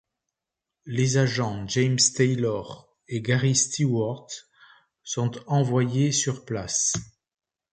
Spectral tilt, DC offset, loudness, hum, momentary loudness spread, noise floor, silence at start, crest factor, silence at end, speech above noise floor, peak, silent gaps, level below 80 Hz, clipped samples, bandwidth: -4 dB/octave; under 0.1%; -24 LUFS; none; 13 LU; -87 dBFS; 0.85 s; 18 dB; 0.65 s; 63 dB; -6 dBFS; none; -58 dBFS; under 0.1%; 9.6 kHz